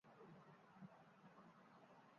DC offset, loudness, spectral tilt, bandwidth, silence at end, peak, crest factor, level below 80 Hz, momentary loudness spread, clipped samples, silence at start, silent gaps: under 0.1%; -66 LUFS; -5.5 dB/octave; 6.8 kHz; 0 s; -50 dBFS; 16 dB; under -90 dBFS; 4 LU; under 0.1%; 0.05 s; none